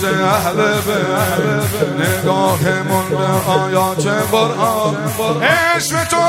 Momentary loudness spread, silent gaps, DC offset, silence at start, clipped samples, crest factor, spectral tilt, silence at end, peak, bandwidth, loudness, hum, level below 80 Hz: 3 LU; none; under 0.1%; 0 s; under 0.1%; 14 dB; -4.5 dB/octave; 0 s; 0 dBFS; 16 kHz; -15 LUFS; none; -48 dBFS